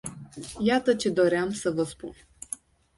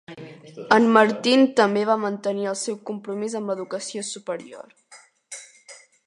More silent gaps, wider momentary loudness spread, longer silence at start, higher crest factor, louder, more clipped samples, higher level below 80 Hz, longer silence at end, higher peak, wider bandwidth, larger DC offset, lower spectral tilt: neither; second, 18 LU vs 23 LU; about the same, 0.05 s vs 0.1 s; about the same, 18 dB vs 22 dB; second, -25 LUFS vs -22 LUFS; neither; first, -58 dBFS vs -72 dBFS; first, 0.45 s vs 0.3 s; second, -10 dBFS vs 0 dBFS; about the same, 11.5 kHz vs 11 kHz; neither; about the same, -4.5 dB/octave vs -4 dB/octave